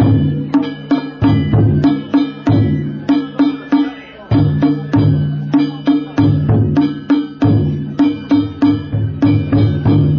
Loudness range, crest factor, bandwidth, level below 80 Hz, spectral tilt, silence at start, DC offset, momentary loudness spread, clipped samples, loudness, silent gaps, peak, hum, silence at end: 1 LU; 12 dB; 6.2 kHz; -32 dBFS; -9.5 dB/octave; 0 s; under 0.1%; 5 LU; under 0.1%; -14 LUFS; none; -2 dBFS; none; 0 s